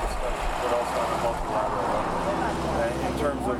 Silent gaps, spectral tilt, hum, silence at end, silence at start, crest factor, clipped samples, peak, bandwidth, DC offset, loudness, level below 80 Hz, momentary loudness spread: none; -5 dB/octave; none; 0 s; 0 s; 14 dB; under 0.1%; -12 dBFS; 18 kHz; under 0.1%; -27 LUFS; -36 dBFS; 2 LU